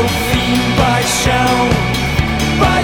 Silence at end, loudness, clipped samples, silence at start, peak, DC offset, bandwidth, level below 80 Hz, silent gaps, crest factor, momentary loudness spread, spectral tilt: 0 s; -13 LUFS; under 0.1%; 0 s; -2 dBFS; under 0.1%; 19.5 kHz; -24 dBFS; none; 12 dB; 3 LU; -4.5 dB/octave